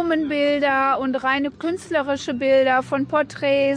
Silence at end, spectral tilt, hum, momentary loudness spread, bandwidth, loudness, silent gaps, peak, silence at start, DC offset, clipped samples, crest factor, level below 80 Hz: 0 s; -5 dB/octave; none; 6 LU; 10.5 kHz; -20 LUFS; none; -8 dBFS; 0 s; under 0.1%; under 0.1%; 12 dB; -58 dBFS